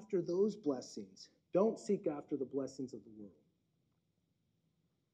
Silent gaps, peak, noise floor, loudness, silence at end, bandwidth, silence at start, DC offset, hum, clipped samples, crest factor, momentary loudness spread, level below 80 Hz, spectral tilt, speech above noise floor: none; -20 dBFS; -81 dBFS; -38 LUFS; 1.85 s; 9.4 kHz; 0 s; under 0.1%; none; under 0.1%; 20 dB; 21 LU; -84 dBFS; -7 dB/octave; 43 dB